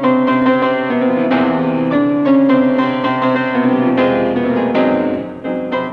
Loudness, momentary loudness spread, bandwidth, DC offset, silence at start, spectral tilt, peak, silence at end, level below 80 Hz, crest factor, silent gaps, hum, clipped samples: -14 LUFS; 6 LU; 5.2 kHz; under 0.1%; 0 s; -8.5 dB/octave; -2 dBFS; 0 s; -52 dBFS; 12 dB; none; none; under 0.1%